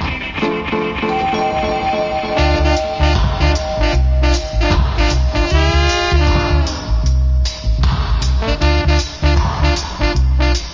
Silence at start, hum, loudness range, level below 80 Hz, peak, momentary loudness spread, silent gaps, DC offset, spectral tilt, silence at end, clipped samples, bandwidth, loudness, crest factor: 0 s; none; 1 LU; -16 dBFS; 0 dBFS; 4 LU; none; under 0.1%; -5.5 dB/octave; 0 s; under 0.1%; 7.6 kHz; -16 LUFS; 14 dB